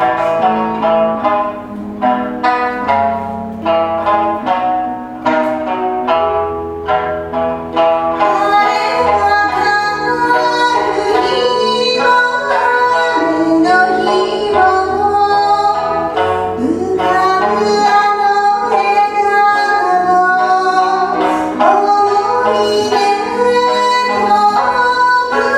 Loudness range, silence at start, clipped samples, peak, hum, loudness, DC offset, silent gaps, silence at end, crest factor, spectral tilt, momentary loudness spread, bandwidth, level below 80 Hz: 4 LU; 0 s; under 0.1%; 0 dBFS; none; -13 LUFS; under 0.1%; none; 0 s; 12 dB; -4 dB/octave; 6 LU; 13 kHz; -46 dBFS